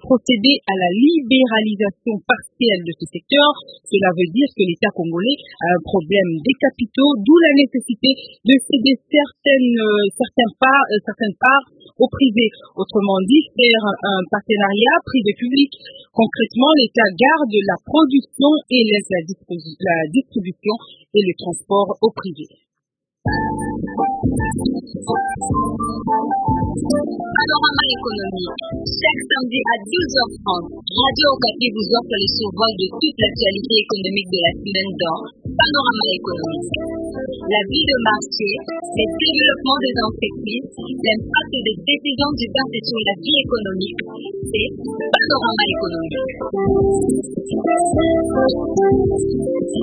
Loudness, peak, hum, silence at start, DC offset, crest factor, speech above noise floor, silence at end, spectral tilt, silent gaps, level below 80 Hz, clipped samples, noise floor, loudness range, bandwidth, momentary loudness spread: -17 LUFS; 0 dBFS; none; 0 s; under 0.1%; 18 dB; 64 dB; 0 s; -5 dB/octave; none; -42 dBFS; under 0.1%; -81 dBFS; 5 LU; 10.5 kHz; 10 LU